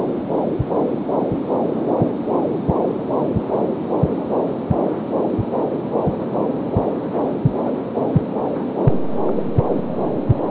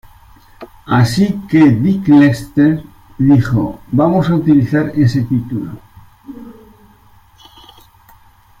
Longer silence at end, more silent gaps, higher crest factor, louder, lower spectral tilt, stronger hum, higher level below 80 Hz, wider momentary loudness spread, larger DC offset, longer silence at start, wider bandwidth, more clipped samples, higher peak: second, 0 s vs 2.1 s; neither; about the same, 16 dB vs 14 dB; second, -21 LUFS vs -13 LUFS; first, -13 dB/octave vs -8 dB/octave; neither; about the same, -40 dBFS vs -42 dBFS; second, 2 LU vs 13 LU; neither; second, 0 s vs 0.6 s; second, 4 kHz vs 15 kHz; neither; second, -4 dBFS vs 0 dBFS